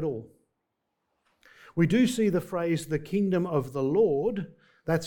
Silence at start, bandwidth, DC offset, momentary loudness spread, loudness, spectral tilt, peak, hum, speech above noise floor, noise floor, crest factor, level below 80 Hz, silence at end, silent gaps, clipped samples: 0 s; 18.5 kHz; under 0.1%; 13 LU; -27 LUFS; -7 dB/octave; -12 dBFS; none; 55 dB; -81 dBFS; 16 dB; -60 dBFS; 0 s; none; under 0.1%